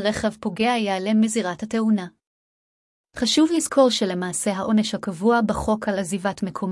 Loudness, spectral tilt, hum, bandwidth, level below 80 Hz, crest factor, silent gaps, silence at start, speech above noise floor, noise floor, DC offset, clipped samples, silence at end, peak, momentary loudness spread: -22 LUFS; -4.5 dB/octave; none; 12 kHz; -50 dBFS; 16 dB; 2.27-3.04 s; 0 s; over 68 dB; under -90 dBFS; under 0.1%; under 0.1%; 0 s; -6 dBFS; 8 LU